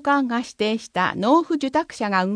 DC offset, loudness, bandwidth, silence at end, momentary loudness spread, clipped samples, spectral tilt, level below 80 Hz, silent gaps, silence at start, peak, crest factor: under 0.1%; -22 LUFS; 10.5 kHz; 0 s; 6 LU; under 0.1%; -5 dB/octave; -62 dBFS; none; 0.05 s; -6 dBFS; 16 dB